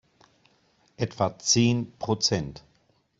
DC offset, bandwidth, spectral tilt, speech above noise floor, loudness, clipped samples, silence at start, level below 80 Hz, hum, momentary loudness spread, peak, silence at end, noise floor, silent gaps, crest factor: under 0.1%; 8 kHz; -4 dB/octave; 41 dB; -25 LUFS; under 0.1%; 1 s; -58 dBFS; none; 12 LU; -8 dBFS; 0.6 s; -67 dBFS; none; 20 dB